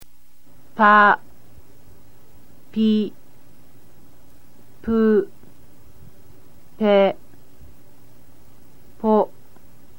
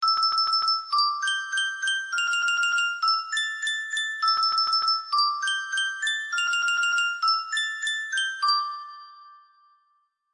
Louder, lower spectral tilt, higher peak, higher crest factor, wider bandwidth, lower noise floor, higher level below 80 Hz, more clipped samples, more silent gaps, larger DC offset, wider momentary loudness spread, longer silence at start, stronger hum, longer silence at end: first, -18 LUFS vs -23 LUFS; first, -7 dB/octave vs 5 dB/octave; first, -2 dBFS vs -12 dBFS; first, 20 dB vs 14 dB; first, 17 kHz vs 11.5 kHz; second, -56 dBFS vs -70 dBFS; first, -56 dBFS vs -80 dBFS; neither; neither; first, 2% vs under 0.1%; first, 19 LU vs 5 LU; about the same, 0 s vs 0 s; neither; second, 0.75 s vs 0.95 s